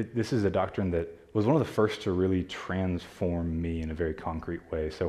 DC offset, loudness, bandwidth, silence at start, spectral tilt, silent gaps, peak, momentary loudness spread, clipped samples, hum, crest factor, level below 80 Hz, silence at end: under 0.1%; -30 LUFS; 13.5 kHz; 0 s; -7.5 dB/octave; none; -12 dBFS; 8 LU; under 0.1%; none; 18 dB; -50 dBFS; 0 s